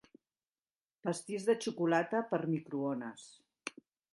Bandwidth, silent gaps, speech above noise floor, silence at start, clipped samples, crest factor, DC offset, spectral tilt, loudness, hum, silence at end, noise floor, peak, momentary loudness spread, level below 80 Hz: 11.5 kHz; none; over 55 dB; 1.05 s; under 0.1%; 22 dB; under 0.1%; -5.5 dB/octave; -35 LUFS; none; 0.45 s; under -90 dBFS; -16 dBFS; 15 LU; -84 dBFS